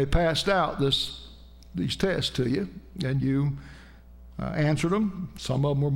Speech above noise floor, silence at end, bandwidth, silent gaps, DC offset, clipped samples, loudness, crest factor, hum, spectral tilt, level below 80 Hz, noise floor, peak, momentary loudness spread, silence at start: 22 dB; 0 s; 16 kHz; none; under 0.1%; under 0.1%; -27 LUFS; 16 dB; none; -6 dB/octave; -40 dBFS; -48 dBFS; -10 dBFS; 13 LU; 0 s